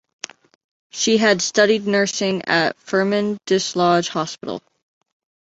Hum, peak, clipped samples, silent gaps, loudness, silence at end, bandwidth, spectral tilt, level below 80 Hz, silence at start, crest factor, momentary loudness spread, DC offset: none; -2 dBFS; under 0.1%; none; -18 LUFS; 0.8 s; 8.2 kHz; -3.5 dB/octave; -64 dBFS; 0.95 s; 18 dB; 17 LU; under 0.1%